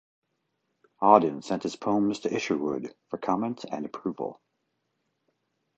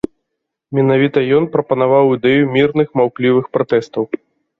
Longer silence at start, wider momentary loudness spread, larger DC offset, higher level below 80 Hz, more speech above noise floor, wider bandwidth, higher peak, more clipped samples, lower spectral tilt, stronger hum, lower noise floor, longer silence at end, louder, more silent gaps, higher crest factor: first, 1 s vs 0.7 s; first, 15 LU vs 10 LU; neither; second, -70 dBFS vs -54 dBFS; second, 51 dB vs 62 dB; first, 8.2 kHz vs 7 kHz; about the same, -2 dBFS vs -2 dBFS; neither; second, -6 dB/octave vs -8.5 dB/octave; neither; about the same, -78 dBFS vs -76 dBFS; first, 1.45 s vs 0.45 s; second, -27 LUFS vs -15 LUFS; neither; first, 26 dB vs 14 dB